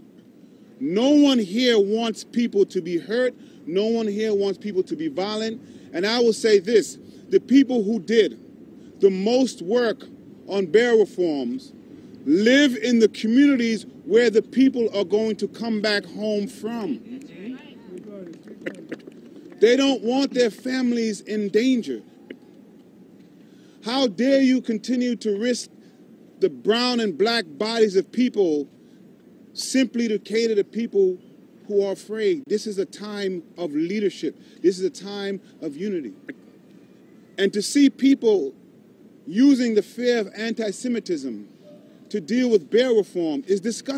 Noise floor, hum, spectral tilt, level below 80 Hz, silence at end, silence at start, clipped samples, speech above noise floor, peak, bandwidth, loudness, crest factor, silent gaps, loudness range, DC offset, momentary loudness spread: -50 dBFS; none; -4.5 dB/octave; -76 dBFS; 0 s; 0.8 s; under 0.1%; 29 dB; -4 dBFS; 13.5 kHz; -22 LUFS; 18 dB; none; 7 LU; under 0.1%; 16 LU